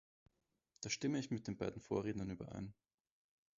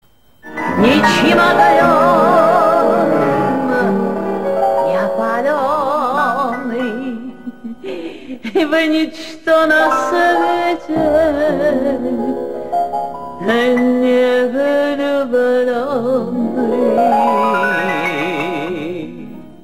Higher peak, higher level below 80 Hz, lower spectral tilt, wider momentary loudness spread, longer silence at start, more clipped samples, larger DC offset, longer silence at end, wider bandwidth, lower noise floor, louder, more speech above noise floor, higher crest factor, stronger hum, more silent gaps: second, -24 dBFS vs 0 dBFS; second, -68 dBFS vs -48 dBFS; about the same, -5.5 dB/octave vs -5.5 dB/octave; about the same, 11 LU vs 13 LU; first, 0.8 s vs 0.45 s; neither; second, under 0.1% vs 1%; first, 0.85 s vs 0.1 s; second, 7.4 kHz vs 16 kHz; first, -79 dBFS vs -39 dBFS; second, -43 LUFS vs -14 LUFS; first, 36 dB vs 26 dB; first, 20 dB vs 14 dB; neither; neither